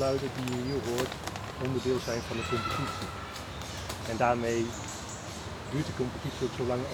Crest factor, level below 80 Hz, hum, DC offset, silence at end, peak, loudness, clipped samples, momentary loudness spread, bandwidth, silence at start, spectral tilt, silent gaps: 22 dB; -52 dBFS; none; under 0.1%; 0 s; -12 dBFS; -33 LUFS; under 0.1%; 10 LU; over 20 kHz; 0 s; -5 dB/octave; none